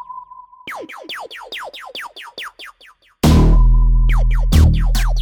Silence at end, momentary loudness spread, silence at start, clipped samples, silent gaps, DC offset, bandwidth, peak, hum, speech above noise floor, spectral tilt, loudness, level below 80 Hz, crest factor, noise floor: 0 s; 19 LU; 0.1 s; under 0.1%; none; under 0.1%; 16 kHz; -4 dBFS; none; 18 dB; -6 dB/octave; -15 LUFS; -16 dBFS; 12 dB; -49 dBFS